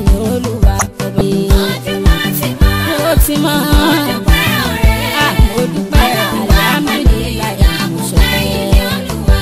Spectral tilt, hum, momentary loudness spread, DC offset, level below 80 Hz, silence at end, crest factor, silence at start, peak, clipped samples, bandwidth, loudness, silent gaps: -5 dB/octave; none; 5 LU; 0.3%; -14 dBFS; 0 s; 12 dB; 0 s; 0 dBFS; under 0.1%; 16.5 kHz; -13 LUFS; none